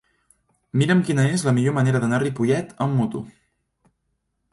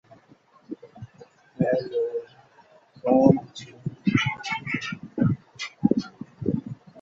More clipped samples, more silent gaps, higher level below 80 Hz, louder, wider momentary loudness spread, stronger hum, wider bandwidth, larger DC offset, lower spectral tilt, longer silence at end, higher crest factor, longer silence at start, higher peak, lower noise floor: neither; neither; about the same, -60 dBFS vs -56 dBFS; first, -21 LUFS vs -25 LUFS; second, 8 LU vs 21 LU; neither; first, 11.5 kHz vs 7.8 kHz; neither; about the same, -6.5 dB/octave vs -7 dB/octave; first, 1.2 s vs 0 s; second, 16 dB vs 24 dB; about the same, 0.75 s vs 0.7 s; second, -6 dBFS vs -2 dBFS; first, -74 dBFS vs -57 dBFS